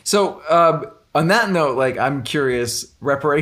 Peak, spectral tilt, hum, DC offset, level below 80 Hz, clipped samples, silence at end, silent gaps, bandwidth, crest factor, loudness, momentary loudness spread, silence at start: -2 dBFS; -4.5 dB/octave; none; under 0.1%; -54 dBFS; under 0.1%; 0 s; none; 16 kHz; 16 dB; -18 LUFS; 8 LU; 0.05 s